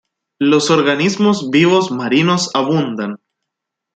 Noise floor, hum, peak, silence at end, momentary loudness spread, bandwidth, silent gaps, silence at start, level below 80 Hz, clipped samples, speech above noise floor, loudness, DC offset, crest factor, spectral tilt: -80 dBFS; none; 0 dBFS; 0.8 s; 9 LU; 9.2 kHz; none; 0.4 s; -60 dBFS; under 0.1%; 66 dB; -14 LUFS; under 0.1%; 14 dB; -5 dB/octave